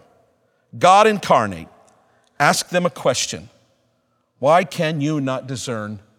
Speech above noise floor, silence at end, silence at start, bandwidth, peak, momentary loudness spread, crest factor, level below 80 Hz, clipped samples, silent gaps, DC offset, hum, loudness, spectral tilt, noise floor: 48 dB; 0.2 s; 0.75 s; 17 kHz; 0 dBFS; 13 LU; 20 dB; -60 dBFS; under 0.1%; none; under 0.1%; none; -18 LUFS; -4 dB/octave; -66 dBFS